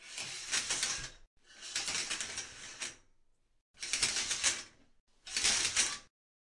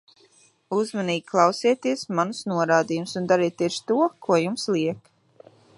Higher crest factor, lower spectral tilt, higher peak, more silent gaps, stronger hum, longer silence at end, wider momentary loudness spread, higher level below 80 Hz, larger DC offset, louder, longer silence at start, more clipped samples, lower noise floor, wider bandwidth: about the same, 24 dB vs 20 dB; second, 1.5 dB/octave vs -5 dB/octave; second, -14 dBFS vs -4 dBFS; first, 1.27-1.37 s, 3.61-3.74 s, 5.00-5.07 s vs none; neither; second, 0.55 s vs 0.8 s; first, 16 LU vs 7 LU; first, -64 dBFS vs -74 dBFS; neither; second, -33 LUFS vs -23 LUFS; second, 0 s vs 0.7 s; neither; first, -69 dBFS vs -59 dBFS; about the same, 12 kHz vs 11.5 kHz